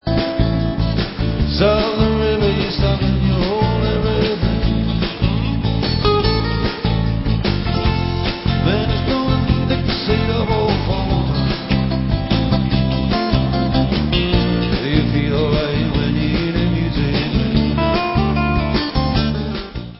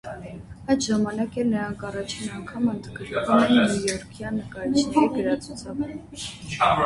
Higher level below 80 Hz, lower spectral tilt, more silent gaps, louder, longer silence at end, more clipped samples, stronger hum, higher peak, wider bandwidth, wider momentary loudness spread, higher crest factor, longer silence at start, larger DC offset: first, -24 dBFS vs -50 dBFS; first, -10.5 dB/octave vs -5 dB/octave; neither; first, -18 LUFS vs -25 LUFS; about the same, 0 s vs 0 s; neither; neither; first, -2 dBFS vs -6 dBFS; second, 5.8 kHz vs 11.5 kHz; second, 3 LU vs 14 LU; about the same, 16 dB vs 18 dB; about the same, 0.05 s vs 0.05 s; neither